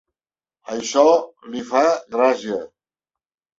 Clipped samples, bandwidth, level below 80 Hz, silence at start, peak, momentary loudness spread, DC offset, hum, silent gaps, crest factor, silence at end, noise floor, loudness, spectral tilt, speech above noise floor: under 0.1%; 8 kHz; -66 dBFS; 0.7 s; -2 dBFS; 15 LU; under 0.1%; none; none; 20 dB; 0.9 s; under -90 dBFS; -19 LUFS; -3 dB/octave; over 71 dB